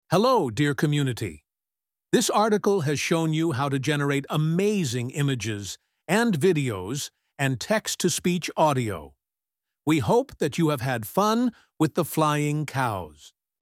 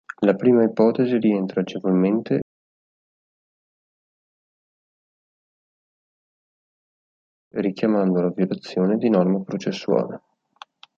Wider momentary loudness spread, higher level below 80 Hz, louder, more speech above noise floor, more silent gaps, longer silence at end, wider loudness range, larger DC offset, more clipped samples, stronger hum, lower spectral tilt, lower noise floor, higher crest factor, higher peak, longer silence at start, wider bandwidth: about the same, 10 LU vs 9 LU; first, -60 dBFS vs -68 dBFS; second, -25 LUFS vs -21 LUFS; first, over 66 dB vs 28 dB; second, none vs 2.42-7.51 s; second, 0.35 s vs 0.8 s; second, 2 LU vs 10 LU; neither; neither; neither; second, -5 dB/octave vs -8.5 dB/octave; first, under -90 dBFS vs -48 dBFS; about the same, 18 dB vs 20 dB; about the same, -6 dBFS vs -4 dBFS; about the same, 0.1 s vs 0.2 s; first, 16.5 kHz vs 7.2 kHz